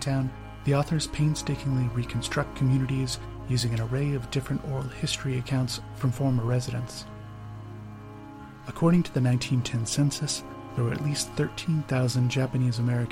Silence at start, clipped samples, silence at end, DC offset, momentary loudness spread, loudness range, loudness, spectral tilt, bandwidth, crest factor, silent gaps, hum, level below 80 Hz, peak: 0 s; under 0.1%; 0 s; under 0.1%; 16 LU; 3 LU; -28 LUFS; -5.5 dB/octave; 15 kHz; 16 dB; none; none; -46 dBFS; -10 dBFS